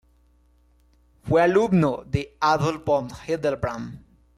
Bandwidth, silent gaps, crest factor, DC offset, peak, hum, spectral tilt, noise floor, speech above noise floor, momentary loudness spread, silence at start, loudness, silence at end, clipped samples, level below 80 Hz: 13 kHz; none; 16 dB; under 0.1%; -8 dBFS; 60 Hz at -45 dBFS; -7 dB/octave; -59 dBFS; 37 dB; 12 LU; 1.25 s; -23 LUFS; 0.4 s; under 0.1%; -50 dBFS